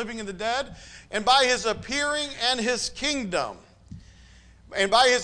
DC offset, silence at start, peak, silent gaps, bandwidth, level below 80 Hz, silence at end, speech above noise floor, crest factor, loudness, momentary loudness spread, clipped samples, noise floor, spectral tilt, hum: under 0.1%; 0 s; -8 dBFS; none; 10.5 kHz; -52 dBFS; 0 s; 27 dB; 18 dB; -24 LUFS; 14 LU; under 0.1%; -51 dBFS; -2 dB/octave; none